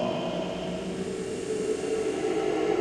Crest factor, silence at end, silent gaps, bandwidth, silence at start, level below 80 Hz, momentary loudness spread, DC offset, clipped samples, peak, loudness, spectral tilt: 14 dB; 0 s; none; 12.5 kHz; 0 s; -56 dBFS; 6 LU; under 0.1%; under 0.1%; -14 dBFS; -30 LUFS; -5 dB/octave